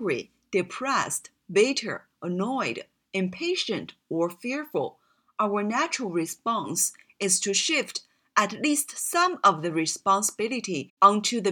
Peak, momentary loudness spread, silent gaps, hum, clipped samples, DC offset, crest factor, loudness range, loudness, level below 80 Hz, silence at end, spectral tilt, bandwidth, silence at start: -4 dBFS; 11 LU; 10.90-10.97 s; none; under 0.1%; under 0.1%; 22 dB; 6 LU; -26 LUFS; -76 dBFS; 0 s; -3 dB/octave; 19 kHz; 0 s